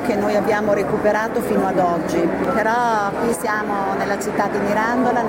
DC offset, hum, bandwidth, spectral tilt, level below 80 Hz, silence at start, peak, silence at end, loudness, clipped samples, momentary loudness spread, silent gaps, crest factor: under 0.1%; none; 16.5 kHz; -5.5 dB/octave; -46 dBFS; 0 s; -6 dBFS; 0 s; -19 LUFS; under 0.1%; 3 LU; none; 14 dB